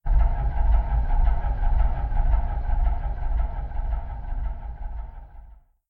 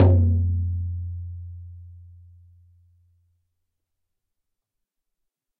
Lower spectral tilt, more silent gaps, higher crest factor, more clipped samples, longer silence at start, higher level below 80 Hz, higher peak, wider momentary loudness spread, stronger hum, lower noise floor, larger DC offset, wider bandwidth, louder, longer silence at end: second, -10.5 dB/octave vs -12.5 dB/octave; neither; second, 14 dB vs 22 dB; neither; about the same, 0.05 s vs 0 s; first, -22 dBFS vs -40 dBFS; second, -10 dBFS vs -4 dBFS; second, 13 LU vs 25 LU; neither; second, -47 dBFS vs -81 dBFS; neither; first, 3.1 kHz vs 2.2 kHz; second, -28 LUFS vs -24 LUFS; second, 0.35 s vs 3.55 s